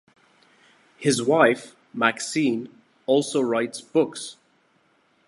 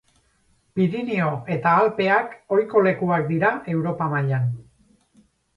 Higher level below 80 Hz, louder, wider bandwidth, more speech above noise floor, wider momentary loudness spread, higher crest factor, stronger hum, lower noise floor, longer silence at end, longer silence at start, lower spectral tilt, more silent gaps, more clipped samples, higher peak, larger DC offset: second, -74 dBFS vs -62 dBFS; about the same, -23 LUFS vs -22 LUFS; first, 11.5 kHz vs 10 kHz; about the same, 42 dB vs 42 dB; first, 17 LU vs 7 LU; about the same, 22 dB vs 18 dB; neither; about the same, -64 dBFS vs -63 dBFS; about the same, 0.95 s vs 0.95 s; first, 1 s vs 0.75 s; second, -4 dB/octave vs -9 dB/octave; neither; neither; about the same, -2 dBFS vs -4 dBFS; neither